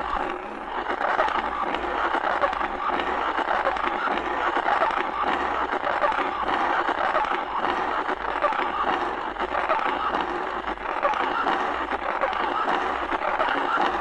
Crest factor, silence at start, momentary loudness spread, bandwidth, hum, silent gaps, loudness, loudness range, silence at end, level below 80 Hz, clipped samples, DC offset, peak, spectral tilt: 18 dB; 0 s; 4 LU; 10.5 kHz; none; none; -25 LUFS; 1 LU; 0 s; -50 dBFS; under 0.1%; under 0.1%; -6 dBFS; -4.5 dB/octave